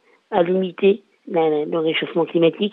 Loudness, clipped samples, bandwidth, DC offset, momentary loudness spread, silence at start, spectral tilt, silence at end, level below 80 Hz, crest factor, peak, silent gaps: -20 LUFS; under 0.1%; 4.1 kHz; under 0.1%; 5 LU; 0.3 s; -9 dB/octave; 0 s; -70 dBFS; 16 dB; -4 dBFS; none